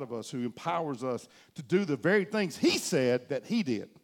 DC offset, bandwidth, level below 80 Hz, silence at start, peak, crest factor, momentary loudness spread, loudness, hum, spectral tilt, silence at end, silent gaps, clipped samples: under 0.1%; 17.5 kHz; -76 dBFS; 0 s; -12 dBFS; 18 dB; 10 LU; -30 LUFS; none; -5 dB/octave; 0.2 s; none; under 0.1%